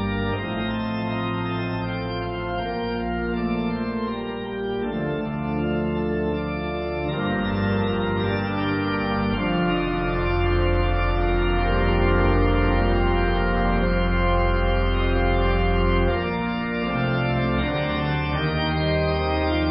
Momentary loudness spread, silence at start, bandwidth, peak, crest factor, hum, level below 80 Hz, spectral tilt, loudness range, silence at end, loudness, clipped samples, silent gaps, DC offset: 6 LU; 0 s; 5.6 kHz; -8 dBFS; 14 dB; none; -28 dBFS; -11.5 dB/octave; 5 LU; 0 s; -23 LUFS; under 0.1%; none; under 0.1%